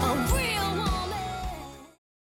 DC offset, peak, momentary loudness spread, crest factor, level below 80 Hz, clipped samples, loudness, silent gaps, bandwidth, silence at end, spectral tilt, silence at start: under 0.1%; -14 dBFS; 17 LU; 14 dB; -36 dBFS; under 0.1%; -28 LUFS; none; 17.5 kHz; 0.45 s; -4.5 dB/octave; 0 s